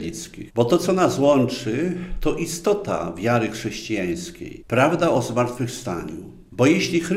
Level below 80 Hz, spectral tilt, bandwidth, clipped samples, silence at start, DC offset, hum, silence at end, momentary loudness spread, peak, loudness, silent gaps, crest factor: -42 dBFS; -5.5 dB/octave; 16 kHz; under 0.1%; 0 s; under 0.1%; none; 0 s; 13 LU; -4 dBFS; -22 LUFS; none; 18 dB